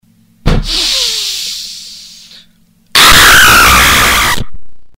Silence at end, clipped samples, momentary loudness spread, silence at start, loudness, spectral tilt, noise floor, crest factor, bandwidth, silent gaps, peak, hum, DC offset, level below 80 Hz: 0.1 s; 0.7%; 18 LU; 0 s; -6 LUFS; -1 dB/octave; -47 dBFS; 10 dB; over 20 kHz; none; 0 dBFS; none; under 0.1%; -22 dBFS